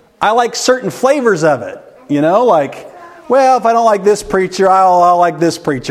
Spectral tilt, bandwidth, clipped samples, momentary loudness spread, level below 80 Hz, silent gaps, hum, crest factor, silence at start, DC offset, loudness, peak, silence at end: -4.5 dB/octave; 15 kHz; under 0.1%; 9 LU; -48 dBFS; none; none; 12 dB; 0.2 s; under 0.1%; -12 LUFS; 0 dBFS; 0 s